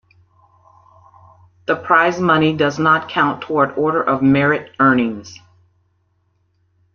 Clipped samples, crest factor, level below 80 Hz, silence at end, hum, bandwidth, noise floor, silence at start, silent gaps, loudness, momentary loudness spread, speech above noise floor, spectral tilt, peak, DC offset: under 0.1%; 16 dB; -56 dBFS; 1.6 s; none; 7 kHz; -63 dBFS; 1.7 s; none; -16 LUFS; 8 LU; 48 dB; -6.5 dB/octave; -2 dBFS; under 0.1%